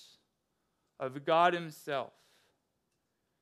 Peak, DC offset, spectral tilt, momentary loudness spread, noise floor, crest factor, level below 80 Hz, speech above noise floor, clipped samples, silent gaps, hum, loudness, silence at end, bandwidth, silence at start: -14 dBFS; under 0.1%; -5 dB/octave; 15 LU; -81 dBFS; 22 dB; under -90 dBFS; 49 dB; under 0.1%; none; none; -32 LUFS; 1.35 s; 14.5 kHz; 1 s